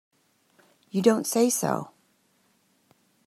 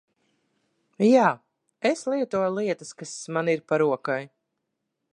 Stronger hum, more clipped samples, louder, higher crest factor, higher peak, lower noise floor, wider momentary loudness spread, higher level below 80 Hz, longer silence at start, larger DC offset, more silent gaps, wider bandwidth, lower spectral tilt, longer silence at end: neither; neither; about the same, -25 LUFS vs -24 LUFS; about the same, 22 dB vs 20 dB; about the same, -6 dBFS vs -6 dBFS; second, -67 dBFS vs -80 dBFS; second, 10 LU vs 13 LU; about the same, -76 dBFS vs -76 dBFS; about the same, 0.95 s vs 1 s; neither; neither; first, 15.5 kHz vs 10.5 kHz; about the same, -4.5 dB/octave vs -5.5 dB/octave; first, 1.4 s vs 0.85 s